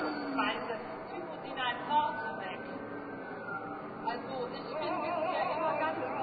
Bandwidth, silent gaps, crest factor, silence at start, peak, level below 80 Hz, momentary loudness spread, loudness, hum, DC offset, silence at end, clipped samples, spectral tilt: 4.9 kHz; none; 16 dB; 0 s; -18 dBFS; -72 dBFS; 10 LU; -35 LUFS; none; under 0.1%; 0 s; under 0.1%; -2.5 dB/octave